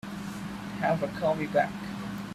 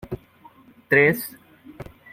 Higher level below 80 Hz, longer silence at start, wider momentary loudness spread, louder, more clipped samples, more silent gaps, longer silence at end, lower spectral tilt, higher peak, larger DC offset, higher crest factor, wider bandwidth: about the same, -56 dBFS vs -54 dBFS; about the same, 0.05 s vs 0.05 s; second, 10 LU vs 25 LU; second, -31 LUFS vs -19 LUFS; neither; neither; second, 0 s vs 0.3 s; about the same, -6.5 dB/octave vs -6 dB/octave; second, -12 dBFS vs -4 dBFS; neither; about the same, 20 dB vs 22 dB; about the same, 15.5 kHz vs 16.5 kHz